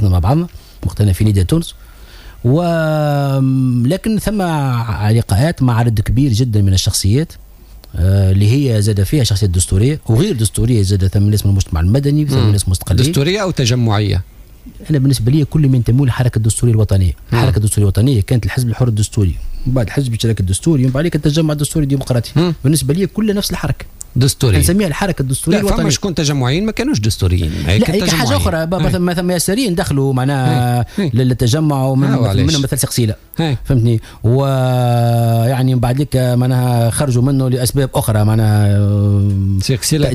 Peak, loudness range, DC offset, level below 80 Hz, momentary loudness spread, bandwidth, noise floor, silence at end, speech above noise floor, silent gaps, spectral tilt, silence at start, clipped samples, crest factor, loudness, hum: -2 dBFS; 2 LU; under 0.1%; -30 dBFS; 4 LU; 16 kHz; -35 dBFS; 0 s; 22 dB; none; -6 dB/octave; 0 s; under 0.1%; 10 dB; -14 LUFS; none